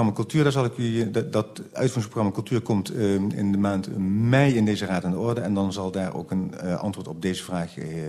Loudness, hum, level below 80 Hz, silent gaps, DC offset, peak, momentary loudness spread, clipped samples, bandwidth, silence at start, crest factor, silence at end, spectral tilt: -25 LUFS; none; -56 dBFS; none; under 0.1%; -6 dBFS; 8 LU; under 0.1%; 13.5 kHz; 0 s; 18 dB; 0 s; -7 dB/octave